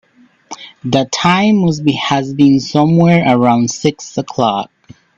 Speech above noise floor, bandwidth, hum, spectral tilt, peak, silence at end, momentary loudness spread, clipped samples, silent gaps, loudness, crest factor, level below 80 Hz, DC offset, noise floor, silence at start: 25 dB; 7.8 kHz; none; -5.5 dB/octave; 0 dBFS; 0.55 s; 14 LU; under 0.1%; none; -13 LUFS; 14 dB; -50 dBFS; under 0.1%; -38 dBFS; 0.5 s